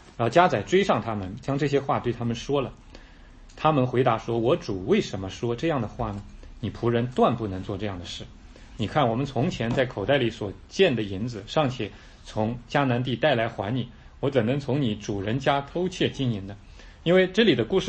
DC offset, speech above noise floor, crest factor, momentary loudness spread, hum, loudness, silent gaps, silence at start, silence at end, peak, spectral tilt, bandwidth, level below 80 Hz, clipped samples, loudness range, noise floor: under 0.1%; 23 dB; 20 dB; 12 LU; none; -25 LUFS; none; 0.05 s; 0 s; -4 dBFS; -6.5 dB/octave; 8.6 kHz; -48 dBFS; under 0.1%; 2 LU; -48 dBFS